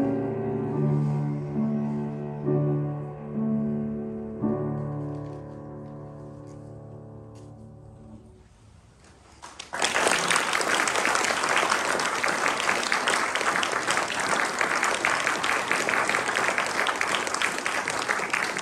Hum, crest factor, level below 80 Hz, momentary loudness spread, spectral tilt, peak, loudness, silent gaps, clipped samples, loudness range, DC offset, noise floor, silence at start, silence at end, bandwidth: none; 22 dB; -58 dBFS; 19 LU; -3.5 dB/octave; -6 dBFS; -25 LUFS; none; under 0.1%; 19 LU; under 0.1%; -53 dBFS; 0 s; 0 s; 15.5 kHz